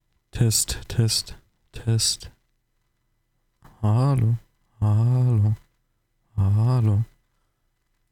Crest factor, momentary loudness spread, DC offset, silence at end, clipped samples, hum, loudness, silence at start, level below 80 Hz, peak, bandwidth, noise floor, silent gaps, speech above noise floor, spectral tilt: 16 dB; 12 LU; under 0.1%; 1.05 s; under 0.1%; none; -23 LUFS; 0.35 s; -46 dBFS; -8 dBFS; 16.5 kHz; -71 dBFS; none; 50 dB; -5 dB/octave